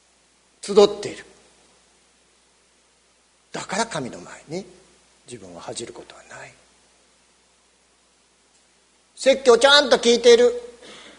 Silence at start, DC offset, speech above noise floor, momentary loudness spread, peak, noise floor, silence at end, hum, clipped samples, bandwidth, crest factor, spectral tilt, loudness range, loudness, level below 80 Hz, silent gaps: 0.65 s; under 0.1%; 41 dB; 27 LU; 0 dBFS; -60 dBFS; 0.5 s; 60 Hz at -60 dBFS; under 0.1%; 10.5 kHz; 22 dB; -2.5 dB/octave; 22 LU; -17 LUFS; -62 dBFS; none